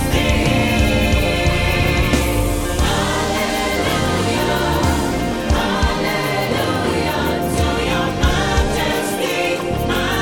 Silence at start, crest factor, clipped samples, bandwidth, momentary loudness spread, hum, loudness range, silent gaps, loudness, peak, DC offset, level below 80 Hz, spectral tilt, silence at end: 0 s; 14 dB; under 0.1%; 19.5 kHz; 3 LU; none; 2 LU; none; -18 LUFS; -2 dBFS; under 0.1%; -24 dBFS; -5 dB/octave; 0 s